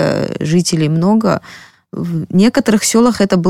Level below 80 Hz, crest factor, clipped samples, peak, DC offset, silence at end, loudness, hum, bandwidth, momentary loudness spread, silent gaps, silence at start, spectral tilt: -46 dBFS; 12 dB; under 0.1%; -2 dBFS; under 0.1%; 0 s; -13 LUFS; none; 16 kHz; 9 LU; none; 0 s; -5.5 dB/octave